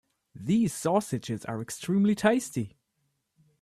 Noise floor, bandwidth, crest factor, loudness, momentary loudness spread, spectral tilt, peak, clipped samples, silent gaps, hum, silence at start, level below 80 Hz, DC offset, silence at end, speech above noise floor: -77 dBFS; 14 kHz; 20 dB; -28 LUFS; 12 LU; -6 dB/octave; -10 dBFS; under 0.1%; none; none; 0.35 s; -64 dBFS; under 0.1%; 0.95 s; 50 dB